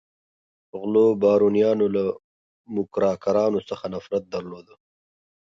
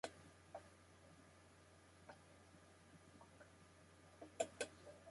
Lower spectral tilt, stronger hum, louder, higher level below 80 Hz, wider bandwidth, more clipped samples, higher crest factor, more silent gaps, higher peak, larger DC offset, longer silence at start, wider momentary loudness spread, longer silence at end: first, -7.5 dB/octave vs -3 dB/octave; neither; first, -22 LUFS vs -56 LUFS; first, -62 dBFS vs -76 dBFS; second, 7.2 kHz vs 11.5 kHz; neither; second, 16 dB vs 30 dB; first, 2.24-2.64 s vs none; first, -8 dBFS vs -28 dBFS; neither; first, 0.75 s vs 0.05 s; second, 15 LU vs 18 LU; first, 0.95 s vs 0 s